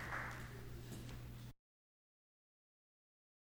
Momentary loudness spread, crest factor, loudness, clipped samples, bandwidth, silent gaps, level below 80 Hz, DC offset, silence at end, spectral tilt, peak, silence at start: 10 LU; 20 dB; -51 LUFS; under 0.1%; over 20 kHz; none; -62 dBFS; under 0.1%; 1.9 s; -5 dB/octave; -32 dBFS; 0 s